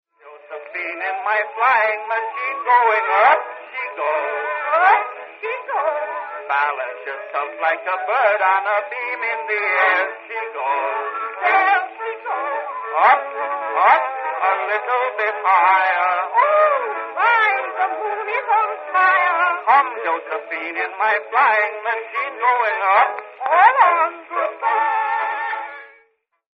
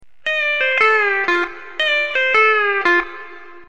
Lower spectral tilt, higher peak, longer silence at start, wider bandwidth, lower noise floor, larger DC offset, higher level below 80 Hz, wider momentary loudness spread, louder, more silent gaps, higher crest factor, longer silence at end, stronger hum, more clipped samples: about the same, -2.5 dB/octave vs -2 dB/octave; about the same, 0 dBFS vs -2 dBFS; about the same, 0.25 s vs 0.25 s; second, 6 kHz vs 9 kHz; first, -61 dBFS vs -37 dBFS; second, under 0.1% vs 1%; second, -86 dBFS vs -56 dBFS; first, 11 LU vs 8 LU; second, -18 LUFS vs -15 LUFS; neither; about the same, 18 dB vs 16 dB; first, 0.7 s vs 0.1 s; neither; neither